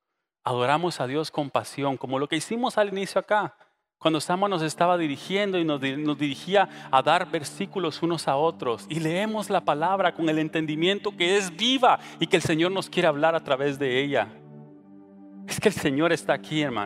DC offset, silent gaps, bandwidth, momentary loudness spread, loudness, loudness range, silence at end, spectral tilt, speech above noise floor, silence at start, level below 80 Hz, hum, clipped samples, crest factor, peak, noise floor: under 0.1%; none; 15.5 kHz; 7 LU; -25 LUFS; 3 LU; 0 s; -4.5 dB/octave; 24 dB; 0.45 s; -66 dBFS; none; under 0.1%; 20 dB; -4 dBFS; -49 dBFS